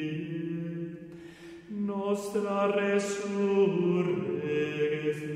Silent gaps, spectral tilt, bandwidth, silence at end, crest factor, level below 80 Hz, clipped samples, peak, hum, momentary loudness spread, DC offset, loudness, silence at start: none; -6.5 dB/octave; 14.5 kHz; 0 s; 14 dB; -70 dBFS; under 0.1%; -16 dBFS; none; 16 LU; under 0.1%; -30 LUFS; 0 s